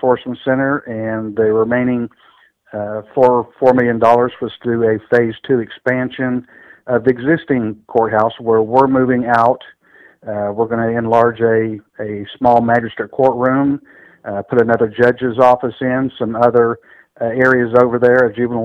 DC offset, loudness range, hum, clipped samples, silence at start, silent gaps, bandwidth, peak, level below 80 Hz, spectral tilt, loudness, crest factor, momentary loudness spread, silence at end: under 0.1%; 3 LU; none; 0.2%; 0.05 s; none; 6.6 kHz; 0 dBFS; -52 dBFS; -8.5 dB/octave; -15 LUFS; 14 dB; 12 LU; 0 s